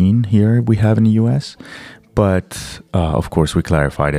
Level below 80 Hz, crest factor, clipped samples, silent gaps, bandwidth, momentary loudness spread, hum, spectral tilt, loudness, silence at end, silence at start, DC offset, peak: -32 dBFS; 16 dB; under 0.1%; none; 13 kHz; 16 LU; none; -7.5 dB/octave; -16 LUFS; 0 s; 0 s; under 0.1%; 0 dBFS